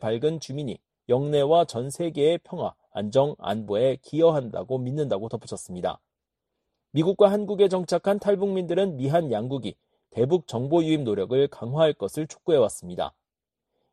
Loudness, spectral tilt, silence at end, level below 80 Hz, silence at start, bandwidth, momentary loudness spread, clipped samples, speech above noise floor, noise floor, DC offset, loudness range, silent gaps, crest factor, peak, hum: -25 LUFS; -6.5 dB/octave; 0.85 s; -64 dBFS; 0 s; 13 kHz; 11 LU; under 0.1%; 63 dB; -87 dBFS; under 0.1%; 3 LU; none; 20 dB; -4 dBFS; none